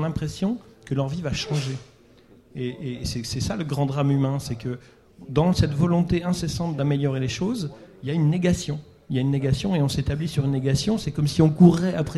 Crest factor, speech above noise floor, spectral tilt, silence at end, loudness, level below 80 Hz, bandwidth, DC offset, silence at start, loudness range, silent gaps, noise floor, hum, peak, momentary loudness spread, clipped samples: 20 dB; 30 dB; -6.5 dB/octave; 0 s; -24 LUFS; -44 dBFS; 12.5 kHz; under 0.1%; 0 s; 6 LU; none; -53 dBFS; none; -4 dBFS; 11 LU; under 0.1%